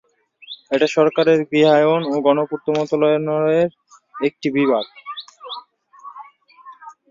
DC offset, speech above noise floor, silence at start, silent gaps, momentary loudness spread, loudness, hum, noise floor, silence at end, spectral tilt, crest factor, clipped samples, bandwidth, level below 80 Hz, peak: under 0.1%; 28 dB; 0.5 s; none; 19 LU; -18 LUFS; none; -45 dBFS; 0.2 s; -6 dB/octave; 16 dB; under 0.1%; 7.6 kHz; -66 dBFS; -2 dBFS